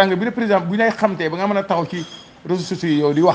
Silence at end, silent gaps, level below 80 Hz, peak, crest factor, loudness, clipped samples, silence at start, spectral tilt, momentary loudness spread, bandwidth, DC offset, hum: 0 s; none; -60 dBFS; 0 dBFS; 18 dB; -19 LUFS; under 0.1%; 0 s; -6.5 dB/octave; 10 LU; 9.2 kHz; under 0.1%; none